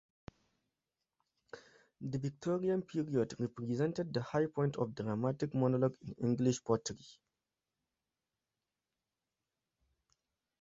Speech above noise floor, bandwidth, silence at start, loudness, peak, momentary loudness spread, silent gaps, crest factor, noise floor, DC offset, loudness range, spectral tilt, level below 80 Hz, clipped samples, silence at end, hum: over 55 dB; 8 kHz; 1.55 s; -36 LUFS; -16 dBFS; 13 LU; none; 22 dB; under -90 dBFS; under 0.1%; 6 LU; -7.5 dB/octave; -72 dBFS; under 0.1%; 3.45 s; none